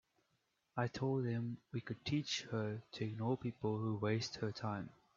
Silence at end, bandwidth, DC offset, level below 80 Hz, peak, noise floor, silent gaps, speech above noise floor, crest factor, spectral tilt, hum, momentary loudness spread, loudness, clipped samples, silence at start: 0.25 s; 7.6 kHz; under 0.1%; -74 dBFS; -22 dBFS; -82 dBFS; none; 42 dB; 18 dB; -5.5 dB/octave; none; 6 LU; -41 LUFS; under 0.1%; 0.75 s